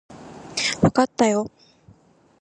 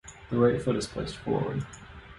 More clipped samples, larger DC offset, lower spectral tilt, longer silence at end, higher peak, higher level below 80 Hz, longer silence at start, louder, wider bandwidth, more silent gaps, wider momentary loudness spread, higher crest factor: neither; neither; second, -4.5 dB/octave vs -6.5 dB/octave; first, 0.95 s vs 0 s; first, -2 dBFS vs -10 dBFS; about the same, -52 dBFS vs -50 dBFS; about the same, 0.1 s vs 0.05 s; first, -21 LUFS vs -29 LUFS; about the same, 11.5 kHz vs 11.5 kHz; neither; first, 19 LU vs 13 LU; about the same, 20 dB vs 20 dB